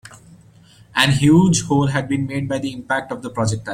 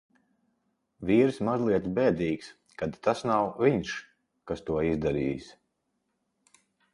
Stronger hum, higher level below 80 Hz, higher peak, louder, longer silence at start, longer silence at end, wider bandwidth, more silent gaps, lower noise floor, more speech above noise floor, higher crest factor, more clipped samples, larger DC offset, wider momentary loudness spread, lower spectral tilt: neither; first, -48 dBFS vs -54 dBFS; first, 0 dBFS vs -10 dBFS; first, -18 LUFS vs -28 LUFS; second, 0.05 s vs 1 s; second, 0 s vs 1.4 s; first, 16 kHz vs 11.5 kHz; neither; second, -48 dBFS vs -78 dBFS; second, 30 dB vs 51 dB; about the same, 18 dB vs 20 dB; neither; neither; about the same, 11 LU vs 13 LU; second, -5 dB/octave vs -7 dB/octave